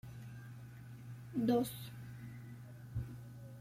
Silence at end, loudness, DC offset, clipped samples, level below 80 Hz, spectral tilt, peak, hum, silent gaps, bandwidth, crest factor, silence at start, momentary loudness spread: 0 s; -42 LUFS; under 0.1%; under 0.1%; -62 dBFS; -7 dB/octave; -22 dBFS; none; none; 16.5 kHz; 20 dB; 0.05 s; 18 LU